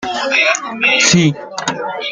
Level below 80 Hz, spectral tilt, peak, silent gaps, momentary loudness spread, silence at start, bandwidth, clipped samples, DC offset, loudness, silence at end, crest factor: -52 dBFS; -3 dB/octave; 0 dBFS; none; 12 LU; 0 s; 9.6 kHz; under 0.1%; under 0.1%; -13 LUFS; 0 s; 16 dB